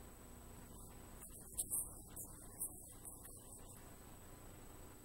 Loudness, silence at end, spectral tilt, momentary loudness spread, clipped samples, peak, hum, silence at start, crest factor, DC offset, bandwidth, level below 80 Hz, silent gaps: -49 LUFS; 0 s; -3 dB/octave; 16 LU; under 0.1%; -26 dBFS; 60 Hz at -65 dBFS; 0 s; 26 dB; under 0.1%; 16 kHz; -62 dBFS; none